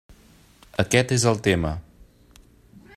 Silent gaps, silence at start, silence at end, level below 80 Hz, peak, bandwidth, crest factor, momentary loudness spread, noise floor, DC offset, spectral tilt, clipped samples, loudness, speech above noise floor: none; 0.8 s; 1.15 s; -46 dBFS; -4 dBFS; 14 kHz; 22 dB; 12 LU; -53 dBFS; under 0.1%; -4.5 dB/octave; under 0.1%; -22 LUFS; 32 dB